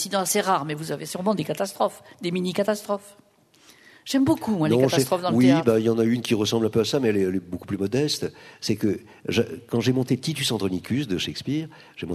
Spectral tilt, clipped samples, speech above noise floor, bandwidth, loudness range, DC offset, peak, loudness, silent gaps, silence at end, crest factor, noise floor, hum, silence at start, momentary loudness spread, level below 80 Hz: -5 dB/octave; under 0.1%; 32 dB; 13.5 kHz; 6 LU; under 0.1%; -6 dBFS; -24 LUFS; none; 0 s; 18 dB; -55 dBFS; none; 0 s; 11 LU; -60 dBFS